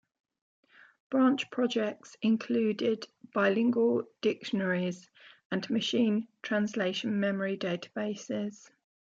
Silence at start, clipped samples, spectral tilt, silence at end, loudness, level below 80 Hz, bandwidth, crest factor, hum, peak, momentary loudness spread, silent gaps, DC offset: 1.1 s; under 0.1%; -5.5 dB/octave; 0.65 s; -30 LUFS; -80 dBFS; 7.8 kHz; 16 dB; none; -14 dBFS; 9 LU; 5.45-5.50 s; under 0.1%